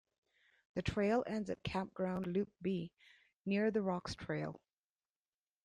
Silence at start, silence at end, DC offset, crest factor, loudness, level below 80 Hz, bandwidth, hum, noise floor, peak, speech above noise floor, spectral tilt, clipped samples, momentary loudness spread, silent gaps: 0.75 s; 1.1 s; under 0.1%; 18 dB; -39 LUFS; -62 dBFS; 10 kHz; none; under -90 dBFS; -22 dBFS; over 52 dB; -7 dB/octave; under 0.1%; 11 LU; none